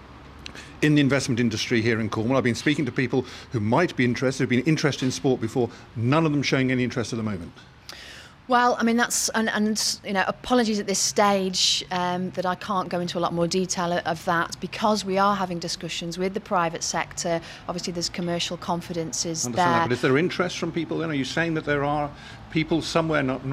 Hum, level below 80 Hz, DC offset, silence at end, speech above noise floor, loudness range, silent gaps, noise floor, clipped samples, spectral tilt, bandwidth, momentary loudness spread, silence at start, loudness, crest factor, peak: none; -54 dBFS; under 0.1%; 0 s; 20 dB; 3 LU; none; -44 dBFS; under 0.1%; -4 dB/octave; 16 kHz; 9 LU; 0 s; -24 LUFS; 18 dB; -8 dBFS